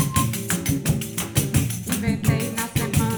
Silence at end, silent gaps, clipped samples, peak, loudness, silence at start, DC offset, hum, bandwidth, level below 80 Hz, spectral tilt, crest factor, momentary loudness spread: 0 s; none; under 0.1%; -6 dBFS; -23 LUFS; 0 s; under 0.1%; none; over 20 kHz; -38 dBFS; -4.5 dB/octave; 18 dB; 3 LU